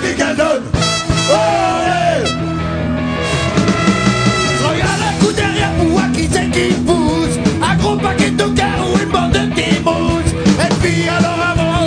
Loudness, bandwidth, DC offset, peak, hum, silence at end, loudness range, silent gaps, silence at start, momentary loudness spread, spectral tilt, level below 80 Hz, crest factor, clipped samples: -14 LUFS; 10 kHz; under 0.1%; 0 dBFS; none; 0 s; 1 LU; none; 0 s; 3 LU; -5 dB/octave; -30 dBFS; 14 dB; under 0.1%